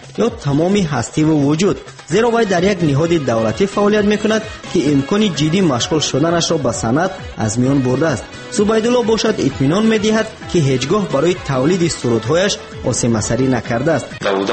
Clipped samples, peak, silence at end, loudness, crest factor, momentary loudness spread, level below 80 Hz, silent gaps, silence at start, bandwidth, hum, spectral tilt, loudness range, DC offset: under 0.1%; -4 dBFS; 0 s; -16 LUFS; 12 dB; 5 LU; -40 dBFS; none; 0 s; 8.8 kHz; none; -5 dB/octave; 1 LU; under 0.1%